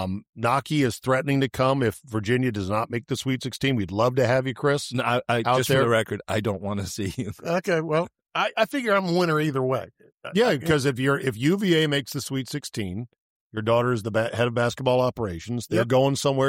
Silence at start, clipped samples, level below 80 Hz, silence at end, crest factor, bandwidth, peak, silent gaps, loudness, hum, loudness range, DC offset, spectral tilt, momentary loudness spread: 0 s; under 0.1%; -56 dBFS; 0 s; 16 dB; 16.5 kHz; -8 dBFS; 0.29-0.33 s, 10.14-10.18 s, 13.20-13.50 s; -24 LUFS; none; 2 LU; under 0.1%; -5.5 dB/octave; 9 LU